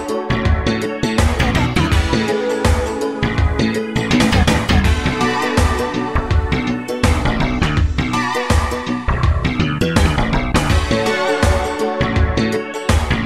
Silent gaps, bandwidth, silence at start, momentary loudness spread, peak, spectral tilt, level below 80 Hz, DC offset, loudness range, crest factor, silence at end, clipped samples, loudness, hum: none; 14 kHz; 0 s; 4 LU; -2 dBFS; -5.5 dB/octave; -22 dBFS; under 0.1%; 1 LU; 14 dB; 0 s; under 0.1%; -17 LUFS; none